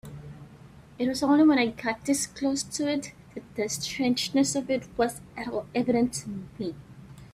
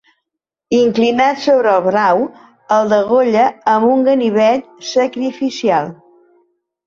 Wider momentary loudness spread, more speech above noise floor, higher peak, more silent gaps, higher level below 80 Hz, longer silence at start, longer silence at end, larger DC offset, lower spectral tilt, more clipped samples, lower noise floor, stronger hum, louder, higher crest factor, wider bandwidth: first, 20 LU vs 7 LU; second, 23 dB vs 67 dB; second, -10 dBFS vs -2 dBFS; neither; about the same, -58 dBFS vs -60 dBFS; second, 0.05 s vs 0.7 s; second, 0.05 s vs 0.9 s; neither; about the same, -4 dB/octave vs -5 dB/octave; neither; second, -50 dBFS vs -80 dBFS; neither; second, -27 LUFS vs -14 LUFS; first, 18 dB vs 12 dB; first, 15 kHz vs 7.6 kHz